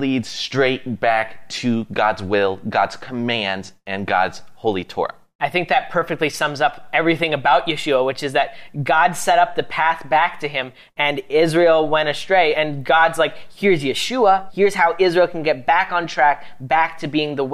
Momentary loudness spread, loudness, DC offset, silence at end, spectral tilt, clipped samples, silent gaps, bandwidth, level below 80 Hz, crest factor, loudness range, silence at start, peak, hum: 9 LU; -19 LUFS; under 0.1%; 0 s; -4.5 dB/octave; under 0.1%; 5.35-5.39 s; 15 kHz; -56 dBFS; 16 dB; 4 LU; 0 s; -2 dBFS; none